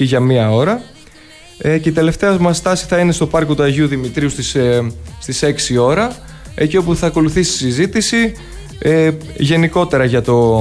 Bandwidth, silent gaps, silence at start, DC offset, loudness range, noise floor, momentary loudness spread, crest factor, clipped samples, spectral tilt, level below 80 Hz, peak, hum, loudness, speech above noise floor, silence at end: 11 kHz; none; 0 s; under 0.1%; 1 LU; -40 dBFS; 8 LU; 12 dB; under 0.1%; -5.5 dB/octave; -34 dBFS; -2 dBFS; none; -14 LUFS; 26 dB; 0 s